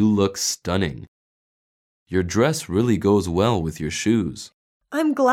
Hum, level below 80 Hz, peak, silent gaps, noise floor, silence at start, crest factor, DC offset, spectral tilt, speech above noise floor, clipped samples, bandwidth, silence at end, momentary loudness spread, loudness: none; -46 dBFS; -6 dBFS; 1.08-2.06 s, 4.54-4.81 s; under -90 dBFS; 0 s; 16 dB; under 0.1%; -5 dB/octave; over 69 dB; under 0.1%; 16.5 kHz; 0 s; 10 LU; -22 LUFS